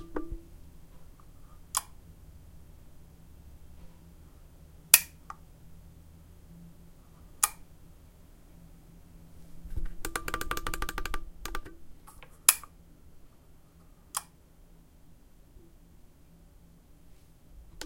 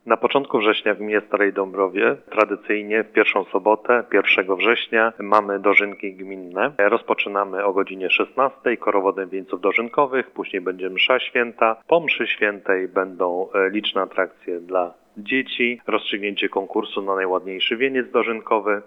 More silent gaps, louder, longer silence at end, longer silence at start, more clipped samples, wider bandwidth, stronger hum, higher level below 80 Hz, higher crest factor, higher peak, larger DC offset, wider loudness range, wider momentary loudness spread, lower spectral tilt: neither; second, -29 LUFS vs -20 LUFS; about the same, 0 s vs 0 s; about the same, 0 s vs 0.05 s; neither; first, 16.5 kHz vs 6 kHz; neither; first, -46 dBFS vs -76 dBFS; first, 36 dB vs 20 dB; about the same, 0 dBFS vs -2 dBFS; neither; first, 17 LU vs 4 LU; first, 32 LU vs 7 LU; second, -0.5 dB/octave vs -6 dB/octave